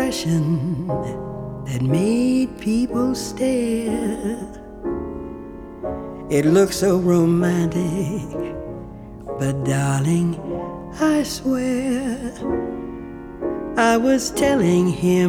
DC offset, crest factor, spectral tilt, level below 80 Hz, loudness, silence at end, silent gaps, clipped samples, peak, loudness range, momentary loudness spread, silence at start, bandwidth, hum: under 0.1%; 18 dB; -6 dB/octave; -42 dBFS; -21 LUFS; 0 s; none; under 0.1%; -4 dBFS; 4 LU; 15 LU; 0 s; 16.5 kHz; none